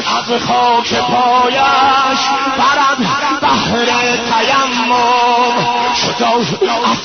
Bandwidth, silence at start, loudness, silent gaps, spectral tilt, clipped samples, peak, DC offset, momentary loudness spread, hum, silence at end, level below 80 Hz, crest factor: 6.6 kHz; 0 s; -12 LUFS; none; -3 dB/octave; under 0.1%; 0 dBFS; 0.2%; 3 LU; none; 0 s; -48 dBFS; 12 dB